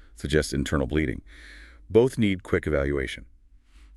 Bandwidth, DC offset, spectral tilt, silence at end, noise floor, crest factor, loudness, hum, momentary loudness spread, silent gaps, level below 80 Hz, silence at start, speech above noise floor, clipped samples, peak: 13 kHz; under 0.1%; -6 dB/octave; 0.1 s; -53 dBFS; 20 dB; -25 LUFS; none; 18 LU; none; -38 dBFS; 0.2 s; 28 dB; under 0.1%; -6 dBFS